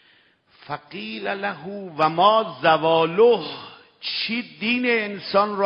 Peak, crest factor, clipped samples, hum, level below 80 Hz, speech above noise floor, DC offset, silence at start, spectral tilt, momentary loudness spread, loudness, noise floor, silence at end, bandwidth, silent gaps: -4 dBFS; 18 dB; under 0.1%; none; -68 dBFS; 37 dB; under 0.1%; 0.7 s; -7 dB/octave; 16 LU; -21 LUFS; -58 dBFS; 0 s; 5.6 kHz; none